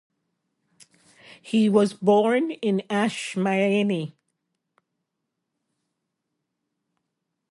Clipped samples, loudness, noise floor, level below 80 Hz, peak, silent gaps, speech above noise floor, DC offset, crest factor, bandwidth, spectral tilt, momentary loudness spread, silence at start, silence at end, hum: under 0.1%; -23 LUFS; -81 dBFS; -74 dBFS; -6 dBFS; none; 59 dB; under 0.1%; 20 dB; 11.5 kHz; -6 dB/octave; 7 LU; 1.45 s; 3.45 s; none